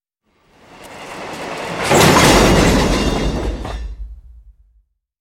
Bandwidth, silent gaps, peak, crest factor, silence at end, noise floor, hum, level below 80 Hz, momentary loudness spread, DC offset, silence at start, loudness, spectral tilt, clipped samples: 16.5 kHz; none; 0 dBFS; 16 dB; 0.9 s; -60 dBFS; none; -26 dBFS; 22 LU; under 0.1%; 0.8 s; -13 LUFS; -4 dB/octave; under 0.1%